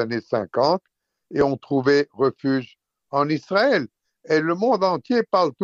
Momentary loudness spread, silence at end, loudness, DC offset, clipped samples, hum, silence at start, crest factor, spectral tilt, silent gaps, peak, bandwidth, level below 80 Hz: 6 LU; 0 s; -22 LUFS; under 0.1%; under 0.1%; none; 0 s; 16 dB; -6.5 dB/octave; none; -6 dBFS; 7.4 kHz; -62 dBFS